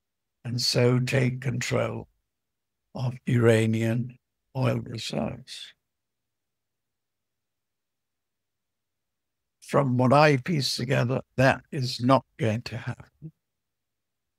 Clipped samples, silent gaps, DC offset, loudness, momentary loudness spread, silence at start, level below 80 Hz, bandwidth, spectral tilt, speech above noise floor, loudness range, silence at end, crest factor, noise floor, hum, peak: under 0.1%; none; under 0.1%; -25 LUFS; 17 LU; 0.45 s; -60 dBFS; 14.5 kHz; -6 dB/octave; 63 dB; 11 LU; 1.1 s; 24 dB; -87 dBFS; none; -4 dBFS